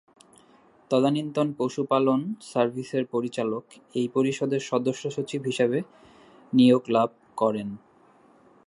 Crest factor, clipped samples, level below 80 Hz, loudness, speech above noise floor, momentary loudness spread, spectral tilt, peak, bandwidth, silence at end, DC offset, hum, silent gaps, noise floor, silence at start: 18 dB; under 0.1%; -72 dBFS; -26 LUFS; 33 dB; 10 LU; -6.5 dB/octave; -8 dBFS; 11.5 kHz; 0.9 s; under 0.1%; none; none; -57 dBFS; 0.9 s